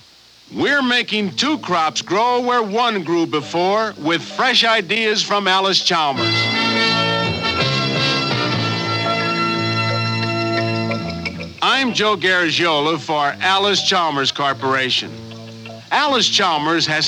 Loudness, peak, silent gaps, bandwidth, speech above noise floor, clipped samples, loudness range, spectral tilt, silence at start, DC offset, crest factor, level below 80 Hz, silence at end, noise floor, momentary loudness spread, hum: -17 LUFS; -4 dBFS; none; 14.5 kHz; 30 dB; under 0.1%; 3 LU; -3.5 dB/octave; 0.5 s; under 0.1%; 14 dB; -54 dBFS; 0 s; -47 dBFS; 6 LU; none